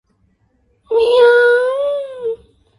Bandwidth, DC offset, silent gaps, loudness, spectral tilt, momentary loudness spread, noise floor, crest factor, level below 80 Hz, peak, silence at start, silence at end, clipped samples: 11.5 kHz; under 0.1%; none; -14 LUFS; -2.5 dB/octave; 15 LU; -60 dBFS; 16 dB; -56 dBFS; 0 dBFS; 0.9 s; 0.45 s; under 0.1%